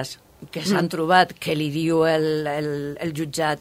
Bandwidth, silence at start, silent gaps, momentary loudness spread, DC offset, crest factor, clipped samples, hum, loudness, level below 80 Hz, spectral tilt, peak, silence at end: 16 kHz; 0 s; none; 11 LU; under 0.1%; 20 dB; under 0.1%; none; -22 LUFS; -58 dBFS; -5 dB/octave; -2 dBFS; 0 s